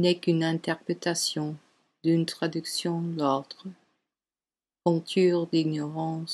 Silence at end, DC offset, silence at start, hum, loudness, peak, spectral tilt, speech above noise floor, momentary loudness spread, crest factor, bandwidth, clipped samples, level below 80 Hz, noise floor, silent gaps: 0 s; under 0.1%; 0 s; none; -28 LUFS; -10 dBFS; -5 dB/octave; over 63 dB; 9 LU; 18 dB; 12.5 kHz; under 0.1%; -78 dBFS; under -90 dBFS; none